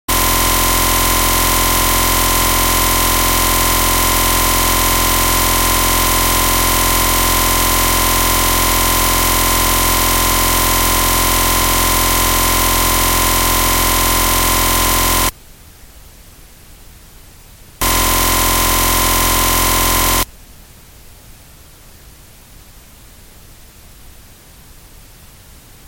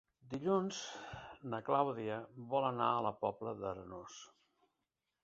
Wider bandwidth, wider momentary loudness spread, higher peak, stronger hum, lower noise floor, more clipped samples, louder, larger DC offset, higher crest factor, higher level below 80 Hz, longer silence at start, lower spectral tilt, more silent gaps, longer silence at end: first, 17 kHz vs 7.6 kHz; second, 0 LU vs 15 LU; first, 0 dBFS vs -18 dBFS; neither; second, -40 dBFS vs -88 dBFS; neither; first, -12 LUFS vs -38 LUFS; neither; second, 14 dB vs 22 dB; first, -24 dBFS vs -72 dBFS; second, 0.1 s vs 0.25 s; second, -2 dB/octave vs -5 dB/octave; neither; first, 1.8 s vs 1 s